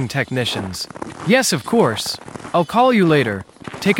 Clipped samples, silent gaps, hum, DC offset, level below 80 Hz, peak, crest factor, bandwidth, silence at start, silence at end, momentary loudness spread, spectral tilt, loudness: under 0.1%; none; none; under 0.1%; -54 dBFS; -2 dBFS; 16 dB; 17 kHz; 0 s; 0 s; 14 LU; -4.5 dB/octave; -18 LUFS